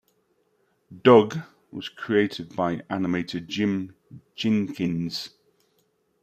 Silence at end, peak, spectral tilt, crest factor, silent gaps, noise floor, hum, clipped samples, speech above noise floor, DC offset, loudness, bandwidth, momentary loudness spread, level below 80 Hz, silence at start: 0.95 s; -4 dBFS; -6.5 dB/octave; 22 dB; none; -69 dBFS; none; under 0.1%; 45 dB; under 0.1%; -24 LUFS; 14.5 kHz; 20 LU; -66 dBFS; 0.9 s